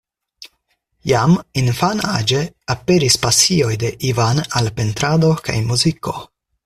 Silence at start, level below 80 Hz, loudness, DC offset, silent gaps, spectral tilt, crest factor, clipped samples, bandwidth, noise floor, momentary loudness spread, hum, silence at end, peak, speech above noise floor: 0.4 s; -44 dBFS; -16 LUFS; under 0.1%; none; -4 dB/octave; 18 dB; under 0.1%; 14.5 kHz; -67 dBFS; 9 LU; none; 0.4 s; 0 dBFS; 51 dB